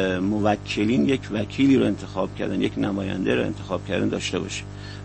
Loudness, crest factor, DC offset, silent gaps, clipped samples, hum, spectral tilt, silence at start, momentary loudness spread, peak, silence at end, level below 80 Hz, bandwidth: -24 LUFS; 16 dB; under 0.1%; none; under 0.1%; 50 Hz at -35 dBFS; -6 dB/octave; 0 s; 9 LU; -6 dBFS; 0 s; -46 dBFS; 8.6 kHz